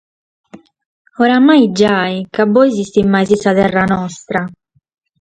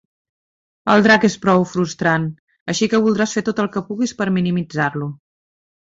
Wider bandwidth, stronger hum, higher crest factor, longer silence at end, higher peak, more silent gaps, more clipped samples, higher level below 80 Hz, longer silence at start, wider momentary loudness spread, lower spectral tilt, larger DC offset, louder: first, 9.2 kHz vs 8 kHz; neither; about the same, 14 dB vs 18 dB; about the same, 0.75 s vs 0.7 s; about the same, 0 dBFS vs -2 dBFS; about the same, 0.86-1.05 s vs 2.39-2.48 s, 2.61-2.66 s; neither; first, -48 dBFS vs -56 dBFS; second, 0.55 s vs 0.85 s; about the same, 11 LU vs 12 LU; about the same, -6 dB/octave vs -5.5 dB/octave; neither; first, -13 LUFS vs -18 LUFS